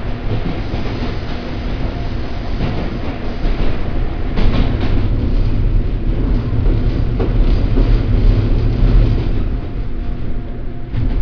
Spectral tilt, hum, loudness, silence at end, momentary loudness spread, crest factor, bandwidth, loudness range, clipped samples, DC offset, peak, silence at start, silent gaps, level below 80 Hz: -9 dB/octave; none; -19 LUFS; 0 s; 9 LU; 14 dB; 5.4 kHz; 6 LU; under 0.1%; under 0.1%; 0 dBFS; 0 s; none; -16 dBFS